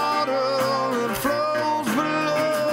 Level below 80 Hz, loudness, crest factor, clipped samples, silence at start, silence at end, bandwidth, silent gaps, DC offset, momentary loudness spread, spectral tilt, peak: -56 dBFS; -23 LUFS; 12 dB; under 0.1%; 0 s; 0 s; 16 kHz; none; under 0.1%; 1 LU; -4 dB/octave; -10 dBFS